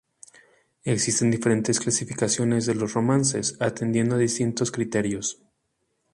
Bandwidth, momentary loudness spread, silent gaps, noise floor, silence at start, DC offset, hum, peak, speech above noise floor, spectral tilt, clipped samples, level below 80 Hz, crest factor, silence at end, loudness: 11.5 kHz; 6 LU; none; -74 dBFS; 0.85 s; under 0.1%; none; -8 dBFS; 51 dB; -4.5 dB/octave; under 0.1%; -60 dBFS; 18 dB; 0.8 s; -24 LUFS